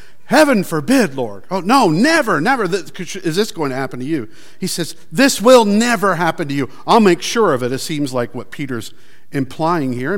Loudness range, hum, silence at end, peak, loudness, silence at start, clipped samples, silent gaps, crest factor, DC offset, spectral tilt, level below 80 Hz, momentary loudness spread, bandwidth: 4 LU; none; 0 s; 0 dBFS; -16 LUFS; 0.3 s; under 0.1%; none; 16 dB; 3%; -4.5 dB/octave; -58 dBFS; 14 LU; 17 kHz